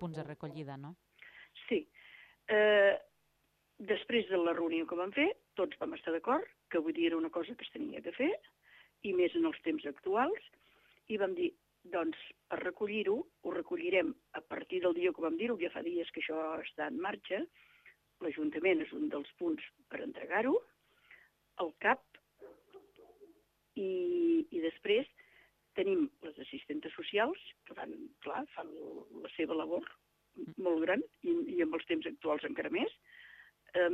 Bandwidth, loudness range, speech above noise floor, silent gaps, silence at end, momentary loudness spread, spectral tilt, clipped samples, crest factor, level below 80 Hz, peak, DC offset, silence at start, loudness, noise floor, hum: 4.5 kHz; 5 LU; 41 dB; none; 0 s; 15 LU; -7 dB/octave; under 0.1%; 20 dB; -78 dBFS; -16 dBFS; under 0.1%; 0 s; -36 LUFS; -77 dBFS; none